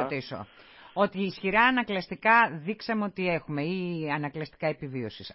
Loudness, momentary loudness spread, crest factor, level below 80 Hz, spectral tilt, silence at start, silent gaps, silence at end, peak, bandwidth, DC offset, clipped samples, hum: -27 LUFS; 14 LU; 20 dB; -62 dBFS; -9.5 dB/octave; 0 s; none; 0 s; -8 dBFS; 5.8 kHz; under 0.1%; under 0.1%; none